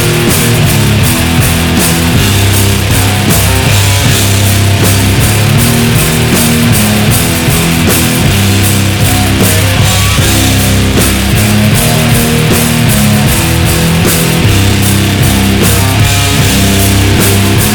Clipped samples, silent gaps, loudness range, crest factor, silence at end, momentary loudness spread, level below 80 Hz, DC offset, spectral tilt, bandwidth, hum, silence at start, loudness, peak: 0.3%; none; 0 LU; 8 dB; 0 s; 1 LU; -20 dBFS; under 0.1%; -4 dB/octave; over 20 kHz; none; 0 s; -7 LUFS; 0 dBFS